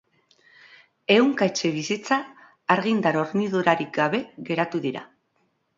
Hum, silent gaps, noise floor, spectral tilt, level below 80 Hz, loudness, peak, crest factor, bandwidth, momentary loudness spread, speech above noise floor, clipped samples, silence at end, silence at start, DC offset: none; none; -70 dBFS; -5 dB/octave; -70 dBFS; -23 LUFS; -2 dBFS; 22 dB; 7.8 kHz; 11 LU; 47 dB; under 0.1%; 0.75 s; 1.1 s; under 0.1%